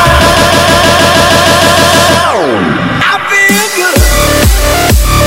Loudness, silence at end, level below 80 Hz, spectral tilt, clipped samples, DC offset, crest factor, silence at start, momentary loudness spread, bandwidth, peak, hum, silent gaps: -6 LUFS; 0 s; -16 dBFS; -3.5 dB/octave; 2%; 0.6%; 6 dB; 0 s; 4 LU; 17 kHz; 0 dBFS; none; none